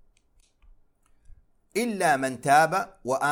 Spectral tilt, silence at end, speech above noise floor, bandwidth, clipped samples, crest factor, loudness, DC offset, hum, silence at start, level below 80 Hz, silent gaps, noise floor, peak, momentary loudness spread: -4 dB/octave; 0 s; 40 dB; 17 kHz; under 0.1%; 20 dB; -24 LUFS; under 0.1%; none; 1.75 s; -60 dBFS; none; -63 dBFS; -6 dBFS; 9 LU